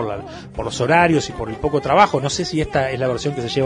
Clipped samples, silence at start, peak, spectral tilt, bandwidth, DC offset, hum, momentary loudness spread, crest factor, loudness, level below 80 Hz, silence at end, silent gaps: under 0.1%; 0 s; 0 dBFS; -5 dB/octave; 11 kHz; under 0.1%; none; 12 LU; 18 dB; -19 LUFS; -42 dBFS; 0 s; none